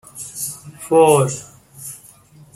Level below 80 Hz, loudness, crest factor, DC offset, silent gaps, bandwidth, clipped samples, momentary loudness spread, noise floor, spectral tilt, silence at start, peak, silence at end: -58 dBFS; -17 LUFS; 18 dB; under 0.1%; none; 15.5 kHz; under 0.1%; 21 LU; -46 dBFS; -5 dB/octave; 0.15 s; 0 dBFS; 0.6 s